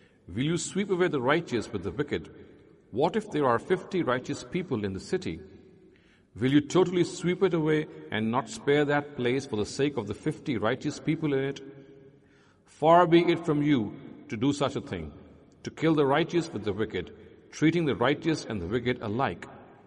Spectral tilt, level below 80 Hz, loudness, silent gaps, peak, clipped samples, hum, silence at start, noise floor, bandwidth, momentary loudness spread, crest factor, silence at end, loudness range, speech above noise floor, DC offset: -6 dB/octave; -60 dBFS; -28 LUFS; none; -8 dBFS; under 0.1%; none; 0.3 s; -60 dBFS; 11 kHz; 14 LU; 20 dB; 0.2 s; 4 LU; 33 dB; under 0.1%